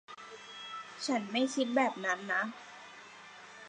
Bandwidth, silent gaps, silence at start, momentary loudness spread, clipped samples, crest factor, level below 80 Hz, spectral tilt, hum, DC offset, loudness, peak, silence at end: 10.5 kHz; none; 0.1 s; 20 LU; under 0.1%; 20 dB; -88 dBFS; -3 dB/octave; none; under 0.1%; -33 LUFS; -16 dBFS; 0 s